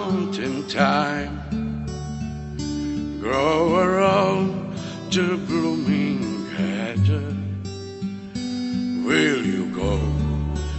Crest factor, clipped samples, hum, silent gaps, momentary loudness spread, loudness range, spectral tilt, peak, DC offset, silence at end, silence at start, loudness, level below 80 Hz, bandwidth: 18 dB; under 0.1%; none; none; 12 LU; 4 LU; -6 dB/octave; -4 dBFS; under 0.1%; 0 s; 0 s; -23 LUFS; -36 dBFS; 8.4 kHz